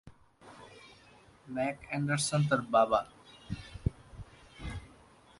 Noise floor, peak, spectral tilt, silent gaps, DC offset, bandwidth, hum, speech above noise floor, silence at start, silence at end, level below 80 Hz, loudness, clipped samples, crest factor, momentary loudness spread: -59 dBFS; -14 dBFS; -5 dB/octave; none; under 0.1%; 11.5 kHz; none; 29 dB; 0.05 s; 0.55 s; -50 dBFS; -32 LUFS; under 0.1%; 22 dB; 25 LU